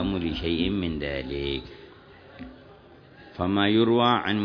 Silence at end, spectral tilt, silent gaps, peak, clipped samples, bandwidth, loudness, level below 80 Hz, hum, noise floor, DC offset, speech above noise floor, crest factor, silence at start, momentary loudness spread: 0 s; -8 dB/octave; none; -6 dBFS; under 0.1%; 5.4 kHz; -25 LUFS; -44 dBFS; none; -50 dBFS; under 0.1%; 26 dB; 20 dB; 0 s; 24 LU